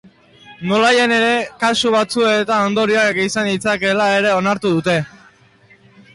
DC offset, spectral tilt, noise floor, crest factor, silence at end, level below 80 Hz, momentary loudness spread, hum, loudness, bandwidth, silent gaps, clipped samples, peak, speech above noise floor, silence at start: under 0.1%; -4 dB/octave; -50 dBFS; 12 dB; 1.05 s; -56 dBFS; 5 LU; none; -15 LUFS; 11.5 kHz; none; under 0.1%; -6 dBFS; 34 dB; 0.5 s